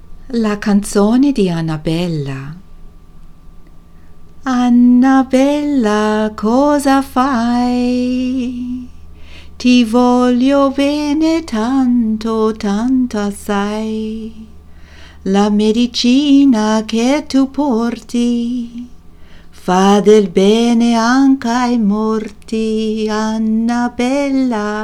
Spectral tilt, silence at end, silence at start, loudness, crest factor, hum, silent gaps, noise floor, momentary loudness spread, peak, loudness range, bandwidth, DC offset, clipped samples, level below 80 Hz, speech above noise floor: -5.5 dB/octave; 0 s; 0.05 s; -14 LUFS; 14 dB; none; none; -36 dBFS; 11 LU; 0 dBFS; 5 LU; 13 kHz; under 0.1%; under 0.1%; -38 dBFS; 23 dB